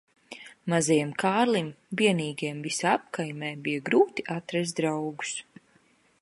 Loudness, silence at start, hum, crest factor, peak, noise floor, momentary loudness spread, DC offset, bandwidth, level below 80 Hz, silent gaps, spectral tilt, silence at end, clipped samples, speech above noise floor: -27 LUFS; 0.3 s; none; 20 dB; -8 dBFS; -64 dBFS; 11 LU; under 0.1%; 11.5 kHz; -74 dBFS; none; -4.5 dB/octave; 0.8 s; under 0.1%; 37 dB